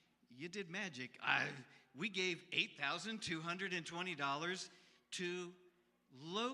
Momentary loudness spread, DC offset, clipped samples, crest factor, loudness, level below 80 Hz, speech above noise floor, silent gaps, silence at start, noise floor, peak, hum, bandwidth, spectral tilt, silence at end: 13 LU; under 0.1%; under 0.1%; 24 dB; -42 LUFS; -88 dBFS; 29 dB; none; 0.3 s; -72 dBFS; -20 dBFS; none; 12.5 kHz; -3 dB/octave; 0 s